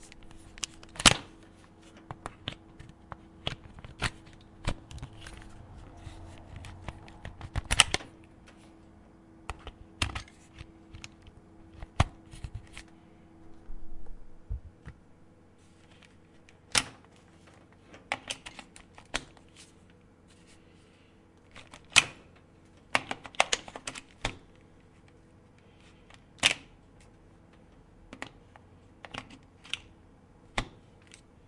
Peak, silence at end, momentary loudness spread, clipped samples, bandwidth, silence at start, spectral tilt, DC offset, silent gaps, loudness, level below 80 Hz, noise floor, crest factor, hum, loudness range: 0 dBFS; 0.3 s; 29 LU; under 0.1%; 12 kHz; 0 s; -2 dB/octave; under 0.1%; none; -31 LUFS; -48 dBFS; -59 dBFS; 38 dB; none; 15 LU